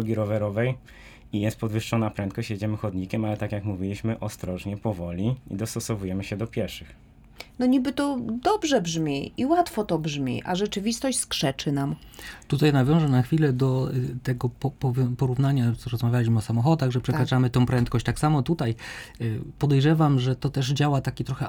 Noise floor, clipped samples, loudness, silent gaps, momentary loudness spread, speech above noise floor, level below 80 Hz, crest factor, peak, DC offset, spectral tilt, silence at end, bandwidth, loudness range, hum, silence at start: -47 dBFS; under 0.1%; -25 LUFS; none; 9 LU; 22 dB; -48 dBFS; 16 dB; -8 dBFS; under 0.1%; -6.5 dB/octave; 0 s; 17.5 kHz; 6 LU; none; 0 s